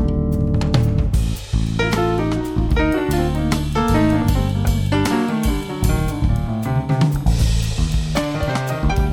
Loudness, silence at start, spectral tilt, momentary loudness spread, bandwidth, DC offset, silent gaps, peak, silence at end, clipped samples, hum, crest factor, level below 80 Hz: -19 LUFS; 0 s; -6.5 dB/octave; 4 LU; 17 kHz; under 0.1%; none; -4 dBFS; 0 s; under 0.1%; none; 14 dB; -22 dBFS